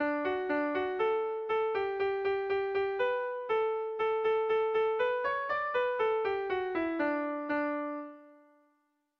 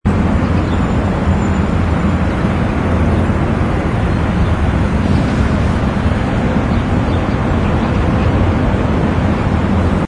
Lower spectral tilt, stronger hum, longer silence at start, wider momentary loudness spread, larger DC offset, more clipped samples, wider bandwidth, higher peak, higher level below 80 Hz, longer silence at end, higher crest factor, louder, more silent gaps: second, -6 dB/octave vs -8 dB/octave; neither; about the same, 0 s vs 0.05 s; about the same, 4 LU vs 2 LU; neither; neither; second, 6 kHz vs 10 kHz; second, -20 dBFS vs 0 dBFS; second, -68 dBFS vs -20 dBFS; first, 0.85 s vs 0 s; about the same, 12 dB vs 12 dB; second, -31 LUFS vs -15 LUFS; neither